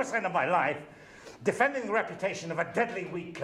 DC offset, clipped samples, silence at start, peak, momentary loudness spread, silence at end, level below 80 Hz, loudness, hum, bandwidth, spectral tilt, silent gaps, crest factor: under 0.1%; under 0.1%; 0 s; -10 dBFS; 13 LU; 0 s; -70 dBFS; -30 LUFS; none; 13 kHz; -5 dB/octave; none; 20 dB